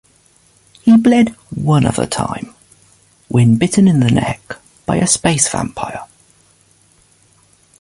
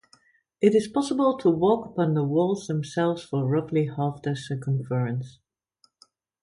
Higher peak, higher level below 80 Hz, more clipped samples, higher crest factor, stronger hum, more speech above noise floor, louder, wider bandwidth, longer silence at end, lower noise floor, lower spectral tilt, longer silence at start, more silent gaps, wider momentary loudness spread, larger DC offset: first, 0 dBFS vs -6 dBFS; first, -42 dBFS vs -64 dBFS; neither; about the same, 16 dB vs 18 dB; neither; about the same, 39 dB vs 42 dB; first, -14 LUFS vs -25 LUFS; about the same, 11.5 kHz vs 11 kHz; first, 1.75 s vs 1.1 s; second, -52 dBFS vs -67 dBFS; second, -5.5 dB/octave vs -7.5 dB/octave; first, 0.85 s vs 0.6 s; neither; first, 16 LU vs 8 LU; neither